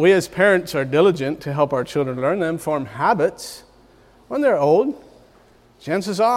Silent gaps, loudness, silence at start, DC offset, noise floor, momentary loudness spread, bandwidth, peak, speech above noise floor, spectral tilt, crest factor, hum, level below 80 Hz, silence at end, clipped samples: none; -19 LUFS; 0 s; under 0.1%; -52 dBFS; 12 LU; 16 kHz; -4 dBFS; 34 dB; -5.5 dB/octave; 16 dB; none; -56 dBFS; 0 s; under 0.1%